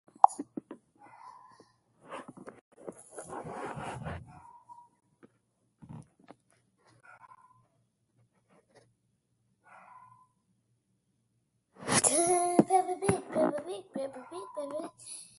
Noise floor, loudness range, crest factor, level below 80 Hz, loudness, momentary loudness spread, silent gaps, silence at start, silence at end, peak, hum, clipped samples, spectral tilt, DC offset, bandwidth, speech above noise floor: -77 dBFS; 19 LU; 34 dB; -64 dBFS; -30 LUFS; 27 LU; 2.61-2.71 s; 0.25 s; 0.15 s; -2 dBFS; none; under 0.1%; -3.5 dB/octave; under 0.1%; 12 kHz; 42 dB